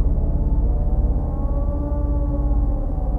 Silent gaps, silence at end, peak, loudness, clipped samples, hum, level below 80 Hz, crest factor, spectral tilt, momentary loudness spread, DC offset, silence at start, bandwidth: none; 0 s; -8 dBFS; -23 LUFS; under 0.1%; none; -20 dBFS; 10 dB; -12.5 dB/octave; 2 LU; under 0.1%; 0 s; 1.7 kHz